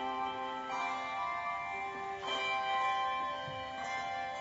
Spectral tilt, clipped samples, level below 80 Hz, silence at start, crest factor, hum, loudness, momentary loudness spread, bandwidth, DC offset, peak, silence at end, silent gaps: 0 dB/octave; under 0.1%; -68 dBFS; 0 s; 14 dB; none; -36 LUFS; 7 LU; 7.6 kHz; under 0.1%; -24 dBFS; 0 s; none